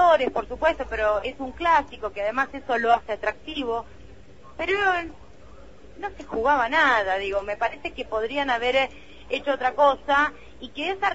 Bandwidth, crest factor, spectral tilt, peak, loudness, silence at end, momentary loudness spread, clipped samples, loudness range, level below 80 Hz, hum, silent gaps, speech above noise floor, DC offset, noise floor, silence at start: 8 kHz; 18 dB; -4 dB/octave; -6 dBFS; -24 LUFS; 0 s; 12 LU; under 0.1%; 4 LU; -48 dBFS; none; none; 24 dB; 0.5%; -48 dBFS; 0 s